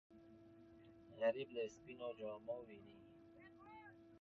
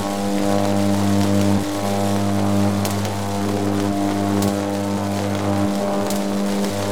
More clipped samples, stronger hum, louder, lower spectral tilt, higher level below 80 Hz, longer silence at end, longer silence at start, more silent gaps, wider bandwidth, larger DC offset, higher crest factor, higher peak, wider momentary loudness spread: neither; neither; second, -46 LUFS vs -20 LUFS; second, -3.5 dB/octave vs -6 dB/octave; second, -82 dBFS vs -54 dBFS; about the same, 0 s vs 0 s; about the same, 0.1 s vs 0 s; neither; second, 6.6 kHz vs over 20 kHz; second, under 0.1% vs 2%; first, 22 dB vs 16 dB; second, -28 dBFS vs -4 dBFS; first, 23 LU vs 4 LU